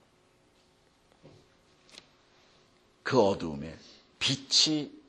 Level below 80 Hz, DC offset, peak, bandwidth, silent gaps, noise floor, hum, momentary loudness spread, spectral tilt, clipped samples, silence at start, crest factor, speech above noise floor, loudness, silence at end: -64 dBFS; under 0.1%; -8 dBFS; 11.5 kHz; none; -65 dBFS; none; 19 LU; -3 dB/octave; under 0.1%; 1.25 s; 24 dB; 37 dB; -27 LUFS; 0.1 s